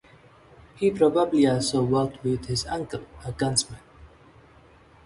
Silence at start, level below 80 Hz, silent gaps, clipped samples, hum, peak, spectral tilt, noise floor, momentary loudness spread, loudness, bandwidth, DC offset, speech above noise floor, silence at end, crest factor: 0.8 s; -50 dBFS; none; under 0.1%; none; -6 dBFS; -5 dB/octave; -53 dBFS; 15 LU; -24 LUFS; 11.5 kHz; under 0.1%; 29 dB; 1 s; 20 dB